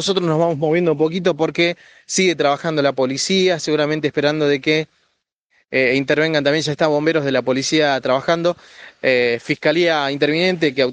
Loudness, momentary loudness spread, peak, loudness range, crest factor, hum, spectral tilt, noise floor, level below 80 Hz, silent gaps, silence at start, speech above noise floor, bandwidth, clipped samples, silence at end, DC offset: -17 LUFS; 3 LU; 0 dBFS; 1 LU; 16 dB; none; -4.5 dB/octave; -68 dBFS; -62 dBFS; 5.34-5.50 s; 0 s; 51 dB; 10 kHz; under 0.1%; 0 s; under 0.1%